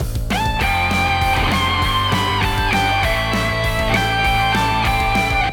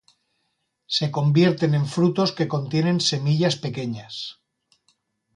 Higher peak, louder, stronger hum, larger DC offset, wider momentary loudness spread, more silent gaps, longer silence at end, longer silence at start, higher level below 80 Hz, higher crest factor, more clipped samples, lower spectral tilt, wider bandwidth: about the same, -4 dBFS vs -6 dBFS; first, -17 LUFS vs -22 LUFS; neither; neither; second, 2 LU vs 12 LU; neither; second, 0 s vs 1.05 s; second, 0 s vs 0.9 s; first, -26 dBFS vs -64 dBFS; about the same, 14 dB vs 18 dB; neither; second, -4.5 dB/octave vs -6 dB/octave; first, over 20 kHz vs 11 kHz